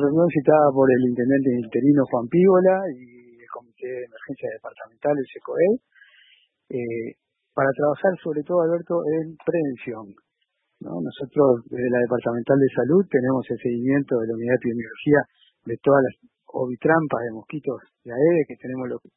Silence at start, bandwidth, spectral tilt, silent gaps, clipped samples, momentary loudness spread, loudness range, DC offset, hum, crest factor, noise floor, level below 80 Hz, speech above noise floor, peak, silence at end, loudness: 0 s; 3.9 kHz; -12.5 dB/octave; none; under 0.1%; 16 LU; 7 LU; under 0.1%; none; 20 dB; -75 dBFS; -64 dBFS; 54 dB; -2 dBFS; 0.2 s; -22 LUFS